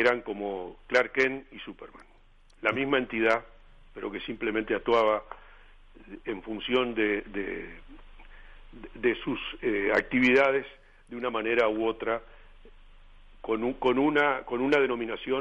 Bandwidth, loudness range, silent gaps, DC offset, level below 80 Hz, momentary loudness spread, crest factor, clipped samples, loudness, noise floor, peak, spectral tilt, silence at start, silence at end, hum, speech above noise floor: 8.8 kHz; 5 LU; none; under 0.1%; -52 dBFS; 19 LU; 18 dB; under 0.1%; -28 LUFS; -57 dBFS; -12 dBFS; -5.5 dB/octave; 0 s; 0 s; none; 29 dB